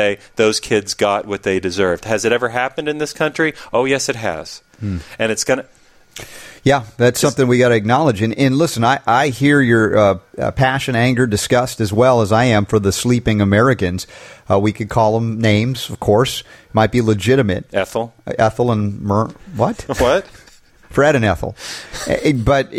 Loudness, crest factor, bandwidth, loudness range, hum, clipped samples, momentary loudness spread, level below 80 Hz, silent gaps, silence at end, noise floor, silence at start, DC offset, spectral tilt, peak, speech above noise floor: -16 LUFS; 14 dB; 15.5 kHz; 5 LU; none; under 0.1%; 9 LU; -40 dBFS; none; 0 s; -44 dBFS; 0 s; under 0.1%; -5.5 dB/octave; -2 dBFS; 28 dB